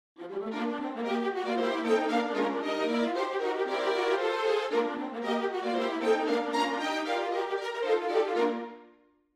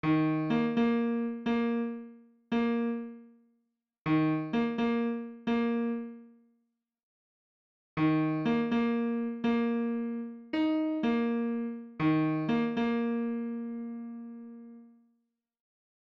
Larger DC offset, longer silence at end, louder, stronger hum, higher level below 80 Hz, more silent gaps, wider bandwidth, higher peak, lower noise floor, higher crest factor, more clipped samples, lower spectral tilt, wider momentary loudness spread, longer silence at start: neither; second, 0.5 s vs 1.2 s; about the same, -30 LUFS vs -31 LUFS; neither; second, -80 dBFS vs -68 dBFS; second, none vs 4.01-4.05 s, 7.03-7.97 s; first, 12.5 kHz vs 6.2 kHz; about the same, -14 dBFS vs -16 dBFS; second, -61 dBFS vs -79 dBFS; about the same, 16 dB vs 14 dB; neither; second, -4 dB/octave vs -8.5 dB/octave; second, 6 LU vs 12 LU; first, 0.2 s vs 0.05 s